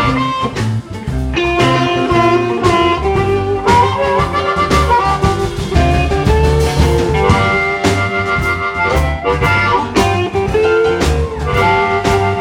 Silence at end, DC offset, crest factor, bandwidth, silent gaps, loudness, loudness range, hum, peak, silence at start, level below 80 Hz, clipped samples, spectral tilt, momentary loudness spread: 0 s; under 0.1%; 12 dB; 16.5 kHz; none; -13 LUFS; 1 LU; none; 0 dBFS; 0 s; -22 dBFS; under 0.1%; -6 dB/octave; 5 LU